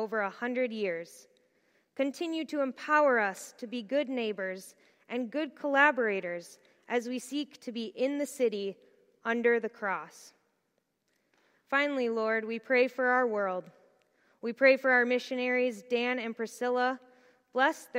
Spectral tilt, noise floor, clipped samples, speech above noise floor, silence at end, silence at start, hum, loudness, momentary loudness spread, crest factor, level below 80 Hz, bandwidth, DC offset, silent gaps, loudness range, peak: -4 dB/octave; -78 dBFS; under 0.1%; 48 dB; 0 s; 0 s; none; -30 LUFS; 14 LU; 22 dB; under -90 dBFS; 16 kHz; under 0.1%; none; 5 LU; -8 dBFS